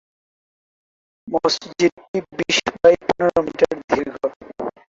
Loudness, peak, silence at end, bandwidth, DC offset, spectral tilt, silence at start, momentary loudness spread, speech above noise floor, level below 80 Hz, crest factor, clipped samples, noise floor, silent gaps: -20 LUFS; -2 dBFS; 0.2 s; 7.8 kHz; under 0.1%; -3.5 dB/octave; 1.25 s; 12 LU; over 71 dB; -54 dBFS; 20 dB; under 0.1%; under -90 dBFS; 1.92-1.97 s, 2.08-2.14 s, 3.84-3.88 s, 4.36-4.40 s